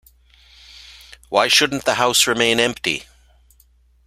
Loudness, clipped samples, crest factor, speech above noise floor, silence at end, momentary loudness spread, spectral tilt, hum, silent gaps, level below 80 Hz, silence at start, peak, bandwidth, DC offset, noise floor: -17 LUFS; under 0.1%; 20 dB; 37 dB; 1.05 s; 9 LU; -1.5 dB/octave; none; none; -52 dBFS; 0.9 s; 0 dBFS; 16 kHz; under 0.1%; -55 dBFS